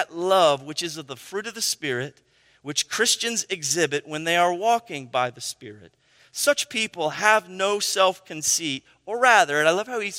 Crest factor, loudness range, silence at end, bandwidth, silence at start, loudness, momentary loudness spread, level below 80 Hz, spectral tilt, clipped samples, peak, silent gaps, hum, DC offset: 22 dB; 4 LU; 0 s; 16 kHz; 0 s; -22 LUFS; 14 LU; -72 dBFS; -1.5 dB/octave; under 0.1%; -2 dBFS; none; none; under 0.1%